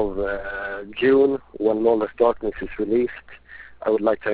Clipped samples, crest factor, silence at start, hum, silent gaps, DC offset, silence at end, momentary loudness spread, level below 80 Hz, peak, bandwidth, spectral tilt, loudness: under 0.1%; 16 dB; 0 s; none; none; 0.2%; 0 s; 12 LU; -48 dBFS; -6 dBFS; 4 kHz; -10 dB/octave; -22 LUFS